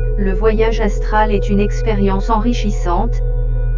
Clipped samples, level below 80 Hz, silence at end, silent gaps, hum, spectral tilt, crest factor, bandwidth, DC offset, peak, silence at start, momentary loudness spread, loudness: under 0.1%; -16 dBFS; 0 s; none; none; -7 dB/octave; 14 dB; 7.4 kHz; 2%; 0 dBFS; 0 s; 5 LU; -17 LUFS